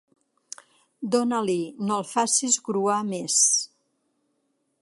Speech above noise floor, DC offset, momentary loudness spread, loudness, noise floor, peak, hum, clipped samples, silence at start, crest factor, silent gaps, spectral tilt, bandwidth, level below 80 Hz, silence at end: 49 dB; under 0.1%; 22 LU; -23 LUFS; -73 dBFS; -8 dBFS; none; under 0.1%; 1 s; 20 dB; none; -2.5 dB/octave; 11.5 kHz; -76 dBFS; 1.15 s